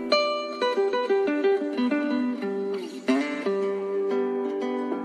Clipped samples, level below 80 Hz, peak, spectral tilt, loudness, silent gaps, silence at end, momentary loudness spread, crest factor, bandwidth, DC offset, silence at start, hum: under 0.1%; -78 dBFS; -8 dBFS; -5 dB/octave; -26 LUFS; none; 0 s; 6 LU; 18 dB; 9.8 kHz; under 0.1%; 0 s; none